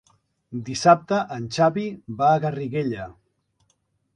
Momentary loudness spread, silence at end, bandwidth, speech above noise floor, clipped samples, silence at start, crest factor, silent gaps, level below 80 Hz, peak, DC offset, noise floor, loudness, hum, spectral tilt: 16 LU; 1.05 s; 10.5 kHz; 48 dB; under 0.1%; 0.5 s; 20 dB; none; -60 dBFS; -4 dBFS; under 0.1%; -70 dBFS; -22 LUFS; none; -6 dB/octave